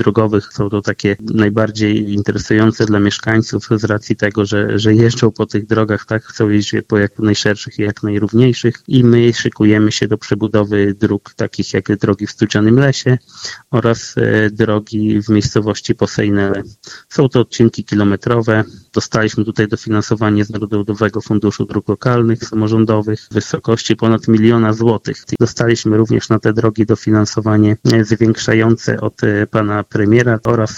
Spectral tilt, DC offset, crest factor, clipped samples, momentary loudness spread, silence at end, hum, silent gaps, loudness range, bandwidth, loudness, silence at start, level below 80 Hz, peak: -6.5 dB/octave; under 0.1%; 14 dB; under 0.1%; 7 LU; 0 s; none; none; 2 LU; 8 kHz; -14 LUFS; 0 s; -44 dBFS; 0 dBFS